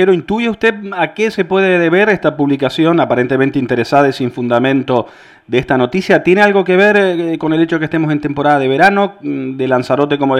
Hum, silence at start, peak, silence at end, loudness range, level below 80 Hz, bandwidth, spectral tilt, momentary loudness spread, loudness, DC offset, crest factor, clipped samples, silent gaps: none; 0 s; 0 dBFS; 0 s; 2 LU; -50 dBFS; 12 kHz; -7 dB/octave; 8 LU; -13 LUFS; under 0.1%; 12 dB; under 0.1%; none